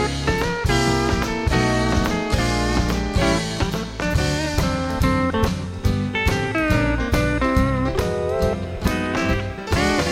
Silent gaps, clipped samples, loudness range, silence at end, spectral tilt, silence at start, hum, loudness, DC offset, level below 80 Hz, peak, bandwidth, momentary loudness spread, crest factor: none; under 0.1%; 1 LU; 0 s; -5.5 dB/octave; 0 s; none; -21 LUFS; under 0.1%; -28 dBFS; -6 dBFS; 16.5 kHz; 4 LU; 16 dB